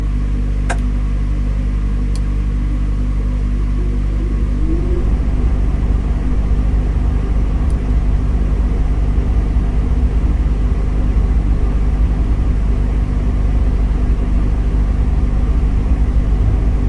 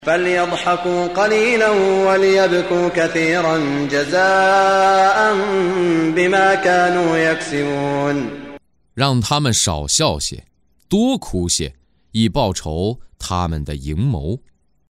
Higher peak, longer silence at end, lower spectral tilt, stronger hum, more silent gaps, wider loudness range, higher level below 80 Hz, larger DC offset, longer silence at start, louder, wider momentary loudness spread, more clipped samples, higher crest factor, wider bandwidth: about the same, -4 dBFS vs -2 dBFS; second, 0 s vs 0.5 s; first, -8.5 dB/octave vs -4.5 dB/octave; first, 50 Hz at -15 dBFS vs none; neither; second, 2 LU vs 6 LU; first, -14 dBFS vs -38 dBFS; neither; about the same, 0 s vs 0 s; about the same, -18 LUFS vs -16 LUFS; second, 3 LU vs 11 LU; neither; about the same, 10 dB vs 14 dB; second, 4.6 kHz vs 15.5 kHz